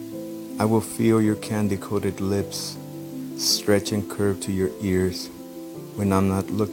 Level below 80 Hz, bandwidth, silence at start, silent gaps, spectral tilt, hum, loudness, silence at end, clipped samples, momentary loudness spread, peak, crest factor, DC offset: -56 dBFS; 17 kHz; 0 s; none; -5 dB/octave; none; -24 LUFS; 0 s; under 0.1%; 15 LU; -4 dBFS; 20 dB; under 0.1%